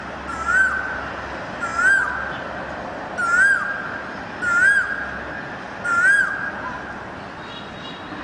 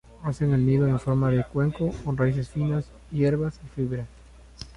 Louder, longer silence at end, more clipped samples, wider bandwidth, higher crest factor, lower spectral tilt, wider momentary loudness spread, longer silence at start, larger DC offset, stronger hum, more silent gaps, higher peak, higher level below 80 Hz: first, -20 LUFS vs -26 LUFS; about the same, 0 s vs 0.05 s; neither; about the same, 10 kHz vs 10.5 kHz; about the same, 16 dB vs 14 dB; second, -3 dB/octave vs -9 dB/octave; first, 17 LU vs 11 LU; second, 0 s vs 0.2 s; neither; neither; neither; first, -6 dBFS vs -12 dBFS; about the same, -48 dBFS vs -46 dBFS